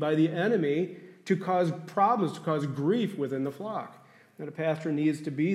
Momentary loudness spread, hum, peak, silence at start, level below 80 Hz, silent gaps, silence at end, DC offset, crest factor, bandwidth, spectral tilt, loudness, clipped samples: 11 LU; none; -12 dBFS; 0 s; -80 dBFS; none; 0 s; under 0.1%; 16 dB; 13 kHz; -7.5 dB/octave; -29 LUFS; under 0.1%